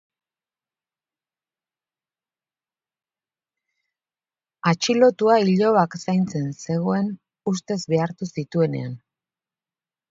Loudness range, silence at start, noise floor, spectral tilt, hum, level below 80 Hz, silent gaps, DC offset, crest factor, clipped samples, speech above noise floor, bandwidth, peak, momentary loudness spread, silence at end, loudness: 6 LU; 4.65 s; under -90 dBFS; -6 dB/octave; none; -68 dBFS; none; under 0.1%; 20 dB; under 0.1%; over 69 dB; 7.8 kHz; -4 dBFS; 12 LU; 1.15 s; -22 LUFS